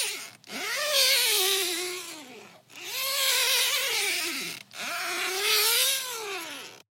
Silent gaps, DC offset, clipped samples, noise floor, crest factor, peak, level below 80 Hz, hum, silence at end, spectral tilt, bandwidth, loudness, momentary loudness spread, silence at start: none; under 0.1%; under 0.1%; -49 dBFS; 20 dB; -8 dBFS; under -90 dBFS; none; 0.15 s; 1.5 dB/octave; 17 kHz; -24 LUFS; 16 LU; 0 s